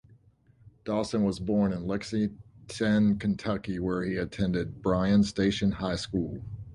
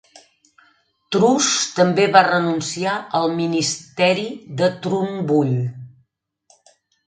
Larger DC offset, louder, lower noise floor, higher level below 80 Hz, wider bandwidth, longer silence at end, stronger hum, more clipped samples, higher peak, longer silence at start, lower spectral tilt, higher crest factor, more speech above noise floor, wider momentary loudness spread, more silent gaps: neither; second, -28 LUFS vs -19 LUFS; second, -61 dBFS vs -66 dBFS; first, -48 dBFS vs -64 dBFS; first, 11 kHz vs 9.6 kHz; second, 0 s vs 1.2 s; neither; neither; second, -12 dBFS vs 0 dBFS; second, 0.65 s vs 1.1 s; first, -6.5 dB/octave vs -4 dB/octave; about the same, 16 dB vs 20 dB; second, 33 dB vs 48 dB; about the same, 8 LU vs 10 LU; neither